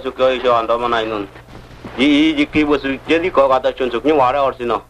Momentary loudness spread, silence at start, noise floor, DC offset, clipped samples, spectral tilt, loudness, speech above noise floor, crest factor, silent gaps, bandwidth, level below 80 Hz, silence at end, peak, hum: 9 LU; 0 s; -35 dBFS; under 0.1%; under 0.1%; -5.5 dB/octave; -16 LUFS; 20 dB; 14 dB; none; 10 kHz; -42 dBFS; 0.05 s; -2 dBFS; none